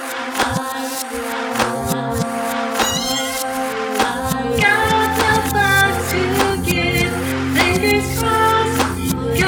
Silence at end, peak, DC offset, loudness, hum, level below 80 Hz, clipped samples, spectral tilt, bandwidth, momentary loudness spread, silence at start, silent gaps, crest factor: 0 s; 0 dBFS; under 0.1%; -17 LUFS; none; -36 dBFS; under 0.1%; -4 dB/octave; 19 kHz; 7 LU; 0 s; none; 18 dB